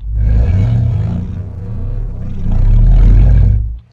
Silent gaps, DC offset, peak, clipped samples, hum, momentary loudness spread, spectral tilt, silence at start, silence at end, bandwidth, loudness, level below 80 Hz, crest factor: none; under 0.1%; 0 dBFS; 0.1%; none; 14 LU; -10 dB/octave; 0 s; 0.15 s; 3.2 kHz; -14 LUFS; -12 dBFS; 10 dB